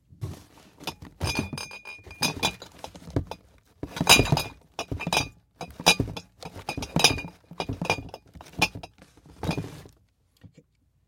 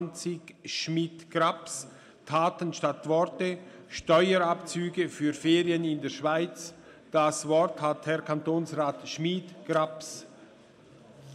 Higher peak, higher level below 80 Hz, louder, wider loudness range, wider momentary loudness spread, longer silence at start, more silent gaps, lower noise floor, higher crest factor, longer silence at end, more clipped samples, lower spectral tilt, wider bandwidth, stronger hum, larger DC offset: first, 0 dBFS vs -12 dBFS; first, -46 dBFS vs -68 dBFS; first, -25 LUFS vs -29 LUFS; first, 8 LU vs 4 LU; first, 22 LU vs 13 LU; first, 0.2 s vs 0 s; neither; first, -64 dBFS vs -55 dBFS; first, 28 dB vs 18 dB; first, 0.6 s vs 0 s; neither; second, -3 dB/octave vs -5 dB/octave; first, 16.5 kHz vs 13 kHz; neither; neither